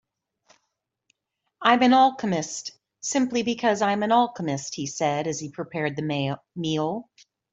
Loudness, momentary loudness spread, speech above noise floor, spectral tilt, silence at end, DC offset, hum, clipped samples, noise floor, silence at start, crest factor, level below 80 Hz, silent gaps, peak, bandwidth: -24 LUFS; 13 LU; 56 dB; -4.5 dB/octave; 0.5 s; under 0.1%; none; under 0.1%; -80 dBFS; 1.6 s; 22 dB; -68 dBFS; none; -4 dBFS; 8.2 kHz